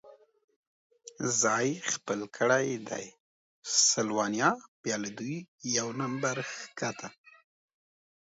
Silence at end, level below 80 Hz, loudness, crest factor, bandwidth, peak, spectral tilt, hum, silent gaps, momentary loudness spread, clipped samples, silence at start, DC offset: 1.25 s; -78 dBFS; -30 LUFS; 22 dB; 8 kHz; -10 dBFS; -2.5 dB/octave; none; 0.44-0.48 s, 0.56-0.90 s, 3.20-3.63 s, 4.68-4.84 s, 5.48-5.58 s; 14 LU; under 0.1%; 0.05 s; under 0.1%